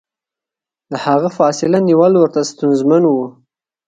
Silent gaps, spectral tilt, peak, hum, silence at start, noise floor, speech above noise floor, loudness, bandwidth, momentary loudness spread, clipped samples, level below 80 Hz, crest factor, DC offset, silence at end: none; -6.5 dB/octave; 0 dBFS; none; 0.9 s; -87 dBFS; 74 dB; -13 LUFS; 9.2 kHz; 10 LU; under 0.1%; -62 dBFS; 14 dB; under 0.1%; 0.55 s